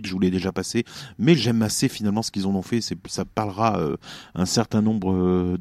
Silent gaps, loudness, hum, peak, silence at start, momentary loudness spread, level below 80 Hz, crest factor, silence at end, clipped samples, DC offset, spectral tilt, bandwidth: none; -23 LUFS; none; -4 dBFS; 0 s; 9 LU; -52 dBFS; 18 dB; 0 s; under 0.1%; under 0.1%; -5.5 dB/octave; 14.5 kHz